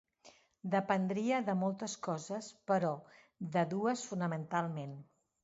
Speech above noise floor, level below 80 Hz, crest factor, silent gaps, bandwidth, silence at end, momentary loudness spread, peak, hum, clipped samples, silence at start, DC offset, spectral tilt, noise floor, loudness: 28 dB; -80 dBFS; 20 dB; none; 8 kHz; 0.4 s; 12 LU; -16 dBFS; none; under 0.1%; 0.25 s; under 0.1%; -6 dB/octave; -64 dBFS; -36 LUFS